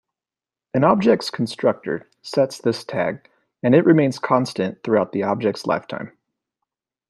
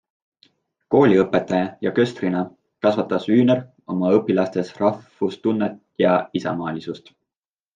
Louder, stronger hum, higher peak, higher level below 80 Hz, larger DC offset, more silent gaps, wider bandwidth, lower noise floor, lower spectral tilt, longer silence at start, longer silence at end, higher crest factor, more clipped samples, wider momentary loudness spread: about the same, -20 LUFS vs -21 LUFS; neither; about the same, -2 dBFS vs -4 dBFS; about the same, -64 dBFS vs -64 dBFS; neither; neither; first, 12.5 kHz vs 9 kHz; about the same, under -90 dBFS vs under -90 dBFS; about the same, -6.5 dB/octave vs -7.5 dB/octave; second, 0.75 s vs 0.9 s; first, 1 s vs 0.8 s; about the same, 18 dB vs 18 dB; neither; about the same, 12 LU vs 10 LU